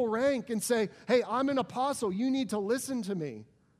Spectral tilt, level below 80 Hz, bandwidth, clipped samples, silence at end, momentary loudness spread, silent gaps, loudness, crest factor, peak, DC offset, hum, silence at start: -4.5 dB/octave; -72 dBFS; 15.5 kHz; under 0.1%; 0.35 s; 7 LU; none; -31 LUFS; 16 dB; -14 dBFS; under 0.1%; none; 0 s